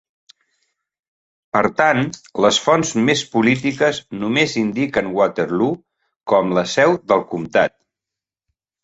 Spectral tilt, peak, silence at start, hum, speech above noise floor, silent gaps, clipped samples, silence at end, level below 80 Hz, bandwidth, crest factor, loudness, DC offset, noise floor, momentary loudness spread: -4.5 dB/octave; -2 dBFS; 1.55 s; none; 69 dB; 6.16-6.20 s; under 0.1%; 1.15 s; -56 dBFS; 8.2 kHz; 18 dB; -18 LUFS; under 0.1%; -87 dBFS; 6 LU